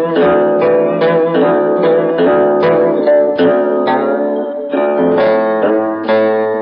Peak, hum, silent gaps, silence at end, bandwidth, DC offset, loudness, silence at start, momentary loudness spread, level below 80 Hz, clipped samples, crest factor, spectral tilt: -2 dBFS; none; none; 0 s; 5.4 kHz; under 0.1%; -12 LUFS; 0 s; 4 LU; -54 dBFS; under 0.1%; 8 dB; -10 dB/octave